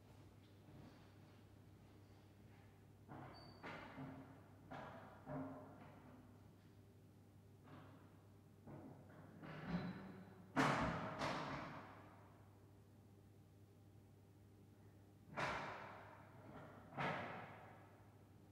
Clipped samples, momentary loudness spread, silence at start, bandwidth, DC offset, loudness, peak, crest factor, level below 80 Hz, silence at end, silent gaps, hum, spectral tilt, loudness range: under 0.1%; 21 LU; 0 s; 15.5 kHz; under 0.1%; -49 LUFS; -26 dBFS; 28 dB; -72 dBFS; 0 s; none; none; -5.5 dB/octave; 17 LU